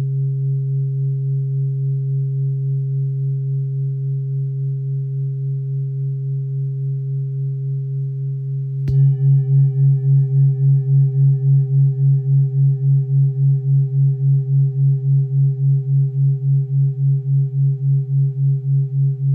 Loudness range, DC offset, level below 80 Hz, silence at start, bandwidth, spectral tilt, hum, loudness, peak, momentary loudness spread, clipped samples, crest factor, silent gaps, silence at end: 7 LU; under 0.1%; -54 dBFS; 0 s; 0.8 kHz; -14 dB/octave; none; -18 LUFS; -8 dBFS; 8 LU; under 0.1%; 10 dB; none; 0 s